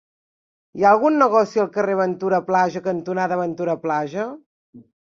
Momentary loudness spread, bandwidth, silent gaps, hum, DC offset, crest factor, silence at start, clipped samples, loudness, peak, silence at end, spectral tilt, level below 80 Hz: 10 LU; 7.4 kHz; 4.46-4.73 s; none; under 0.1%; 18 dB; 0.75 s; under 0.1%; -20 LUFS; -2 dBFS; 0.2 s; -7 dB/octave; -66 dBFS